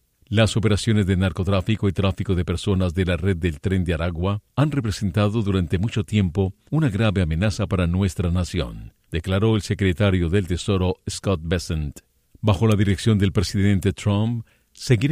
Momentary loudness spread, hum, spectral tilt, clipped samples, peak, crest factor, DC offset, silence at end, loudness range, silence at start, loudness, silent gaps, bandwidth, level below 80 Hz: 6 LU; none; -6.5 dB/octave; under 0.1%; -6 dBFS; 16 dB; under 0.1%; 0 s; 1 LU; 0.3 s; -22 LUFS; none; 14 kHz; -38 dBFS